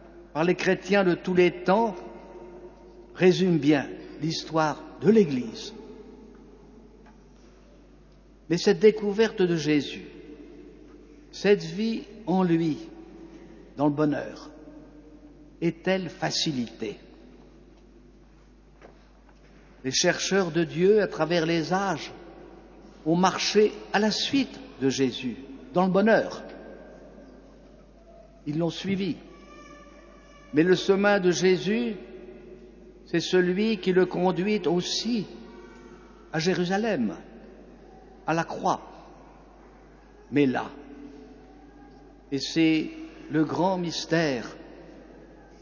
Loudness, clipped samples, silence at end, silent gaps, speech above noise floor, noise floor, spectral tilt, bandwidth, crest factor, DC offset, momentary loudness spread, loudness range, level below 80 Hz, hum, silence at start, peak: -25 LUFS; under 0.1%; 0.35 s; none; 29 dB; -54 dBFS; -5 dB/octave; 7.2 kHz; 20 dB; under 0.1%; 24 LU; 8 LU; -56 dBFS; none; 0.05 s; -6 dBFS